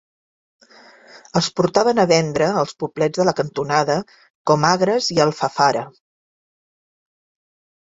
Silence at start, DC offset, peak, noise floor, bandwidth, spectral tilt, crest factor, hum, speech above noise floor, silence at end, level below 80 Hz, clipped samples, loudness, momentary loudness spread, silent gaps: 1.15 s; under 0.1%; 0 dBFS; -48 dBFS; 8 kHz; -4.5 dB/octave; 20 dB; none; 29 dB; 2 s; -58 dBFS; under 0.1%; -18 LUFS; 8 LU; 4.30-4.45 s